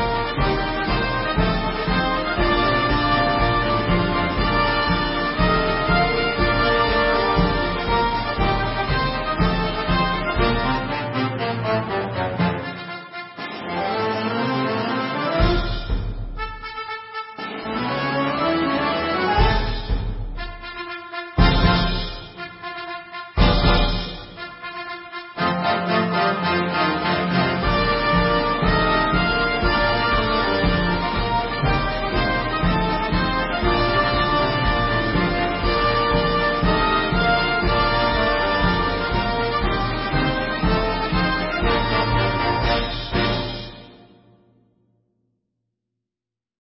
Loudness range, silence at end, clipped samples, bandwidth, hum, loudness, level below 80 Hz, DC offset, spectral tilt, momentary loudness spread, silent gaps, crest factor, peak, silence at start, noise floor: 5 LU; 2.7 s; under 0.1%; 5.8 kHz; none; -21 LUFS; -28 dBFS; under 0.1%; -10 dB/octave; 12 LU; none; 18 dB; -4 dBFS; 0 s; -89 dBFS